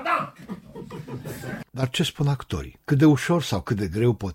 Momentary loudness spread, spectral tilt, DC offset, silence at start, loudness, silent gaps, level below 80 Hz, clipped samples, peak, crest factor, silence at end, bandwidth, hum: 20 LU; -6 dB/octave; under 0.1%; 0 s; -24 LUFS; none; -48 dBFS; under 0.1%; -8 dBFS; 16 dB; 0 s; 16.5 kHz; none